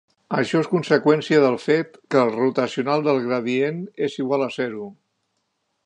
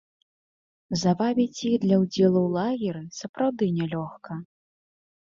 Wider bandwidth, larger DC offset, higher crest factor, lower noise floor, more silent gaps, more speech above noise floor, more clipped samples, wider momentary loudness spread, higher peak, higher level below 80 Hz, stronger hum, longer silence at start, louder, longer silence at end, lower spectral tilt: first, 9.6 kHz vs 7.6 kHz; neither; about the same, 18 dB vs 18 dB; second, -73 dBFS vs under -90 dBFS; second, none vs 3.29-3.34 s; second, 53 dB vs over 66 dB; neither; second, 9 LU vs 15 LU; first, -2 dBFS vs -8 dBFS; second, -72 dBFS vs -64 dBFS; neither; second, 0.3 s vs 0.9 s; first, -21 LUFS vs -25 LUFS; about the same, 0.95 s vs 0.9 s; about the same, -6.5 dB/octave vs -6.5 dB/octave